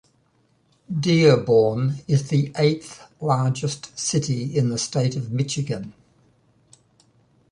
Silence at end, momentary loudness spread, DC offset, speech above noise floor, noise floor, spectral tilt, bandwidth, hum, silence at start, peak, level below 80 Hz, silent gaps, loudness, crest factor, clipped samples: 1.6 s; 13 LU; under 0.1%; 42 dB; -63 dBFS; -5.5 dB/octave; 11 kHz; none; 0.9 s; -4 dBFS; -58 dBFS; none; -22 LUFS; 20 dB; under 0.1%